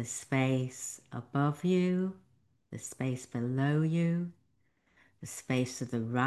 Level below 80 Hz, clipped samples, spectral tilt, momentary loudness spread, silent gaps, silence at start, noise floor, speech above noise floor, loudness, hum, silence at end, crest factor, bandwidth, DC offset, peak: -70 dBFS; under 0.1%; -6 dB/octave; 14 LU; none; 0 s; -74 dBFS; 42 dB; -32 LUFS; none; 0 s; 18 dB; 12.5 kHz; under 0.1%; -14 dBFS